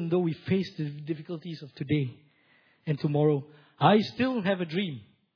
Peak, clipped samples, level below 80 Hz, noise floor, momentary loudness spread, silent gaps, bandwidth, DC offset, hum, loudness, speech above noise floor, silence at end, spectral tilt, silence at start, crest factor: -8 dBFS; under 0.1%; -68 dBFS; -64 dBFS; 15 LU; none; 5.4 kHz; under 0.1%; none; -29 LUFS; 37 dB; 0.35 s; -8.5 dB/octave; 0 s; 22 dB